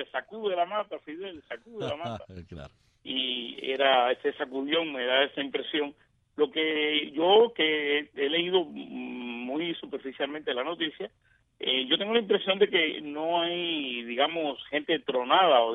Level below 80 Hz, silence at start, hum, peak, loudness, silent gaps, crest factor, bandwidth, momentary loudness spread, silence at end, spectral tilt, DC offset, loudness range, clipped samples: -68 dBFS; 0 s; none; -8 dBFS; -27 LUFS; none; 20 dB; 6.4 kHz; 16 LU; 0 s; -6 dB/octave; under 0.1%; 6 LU; under 0.1%